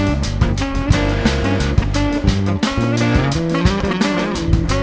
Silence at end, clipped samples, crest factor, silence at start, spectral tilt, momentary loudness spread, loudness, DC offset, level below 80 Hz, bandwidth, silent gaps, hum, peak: 0 s; under 0.1%; 16 dB; 0 s; -6 dB/octave; 3 LU; -17 LUFS; under 0.1%; -22 dBFS; 8 kHz; none; none; 0 dBFS